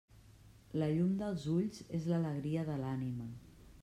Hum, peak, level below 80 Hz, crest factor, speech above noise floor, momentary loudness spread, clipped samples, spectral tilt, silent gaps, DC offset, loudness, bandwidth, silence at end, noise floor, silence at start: none; -22 dBFS; -64 dBFS; 14 dB; 24 dB; 10 LU; under 0.1%; -8.5 dB/octave; none; under 0.1%; -37 LUFS; 12 kHz; 0 s; -60 dBFS; 0.15 s